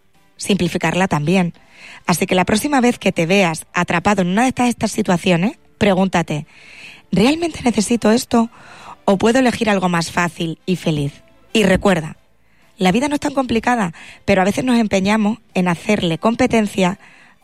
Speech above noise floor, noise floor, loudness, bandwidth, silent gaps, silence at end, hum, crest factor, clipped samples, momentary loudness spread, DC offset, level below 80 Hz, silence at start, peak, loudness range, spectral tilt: 40 dB; -56 dBFS; -17 LUFS; 15 kHz; none; 0.45 s; none; 14 dB; under 0.1%; 8 LU; 0.5%; -46 dBFS; 0.4 s; -4 dBFS; 2 LU; -5 dB/octave